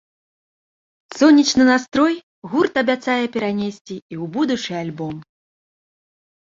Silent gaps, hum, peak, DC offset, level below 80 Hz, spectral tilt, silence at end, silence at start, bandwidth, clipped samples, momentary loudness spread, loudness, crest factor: 2.23-2.42 s, 3.81-3.85 s, 4.02-4.09 s; none; -2 dBFS; under 0.1%; -58 dBFS; -4.5 dB/octave; 1.35 s; 1.1 s; 7.8 kHz; under 0.1%; 17 LU; -18 LUFS; 18 dB